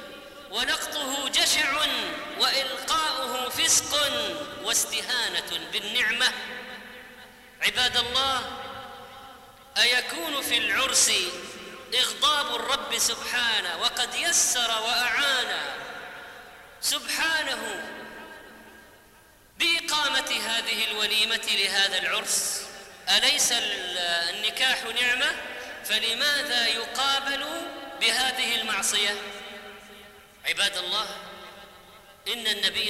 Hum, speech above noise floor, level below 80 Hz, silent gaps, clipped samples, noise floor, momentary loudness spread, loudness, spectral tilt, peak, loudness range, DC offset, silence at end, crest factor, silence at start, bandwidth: none; 29 dB; -60 dBFS; none; under 0.1%; -55 dBFS; 18 LU; -24 LUFS; 1 dB/octave; -10 dBFS; 5 LU; under 0.1%; 0 s; 18 dB; 0 s; 16 kHz